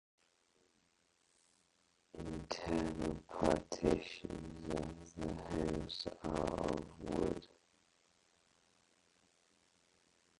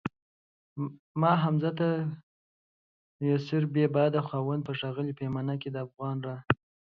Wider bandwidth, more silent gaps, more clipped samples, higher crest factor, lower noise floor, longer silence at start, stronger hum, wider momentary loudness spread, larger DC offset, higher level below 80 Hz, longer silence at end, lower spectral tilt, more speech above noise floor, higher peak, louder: first, 11.5 kHz vs 6 kHz; second, none vs 0.22-0.76 s, 0.99-1.15 s, 2.23-3.19 s; neither; about the same, 26 dB vs 24 dB; second, -77 dBFS vs under -90 dBFS; first, 2.15 s vs 0.05 s; neither; about the same, 11 LU vs 12 LU; neither; first, -56 dBFS vs -64 dBFS; first, 2.95 s vs 0.4 s; second, -6 dB/octave vs -9.5 dB/octave; second, 37 dB vs over 61 dB; second, -16 dBFS vs -6 dBFS; second, -41 LUFS vs -30 LUFS